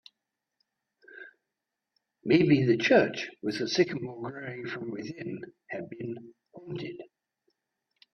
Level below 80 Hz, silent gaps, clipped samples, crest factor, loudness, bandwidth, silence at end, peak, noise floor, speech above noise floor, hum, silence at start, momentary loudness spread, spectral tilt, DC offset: -70 dBFS; none; under 0.1%; 22 dB; -28 LUFS; 8.6 kHz; 1.1 s; -8 dBFS; -87 dBFS; 58 dB; none; 1.1 s; 20 LU; -6 dB/octave; under 0.1%